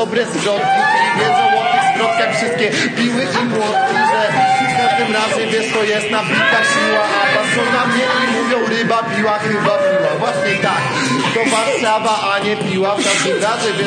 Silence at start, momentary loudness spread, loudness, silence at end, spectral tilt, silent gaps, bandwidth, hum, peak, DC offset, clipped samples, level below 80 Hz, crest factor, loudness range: 0 s; 3 LU; -14 LUFS; 0 s; -3.5 dB/octave; none; 9.8 kHz; none; 0 dBFS; under 0.1%; under 0.1%; -62 dBFS; 14 dB; 1 LU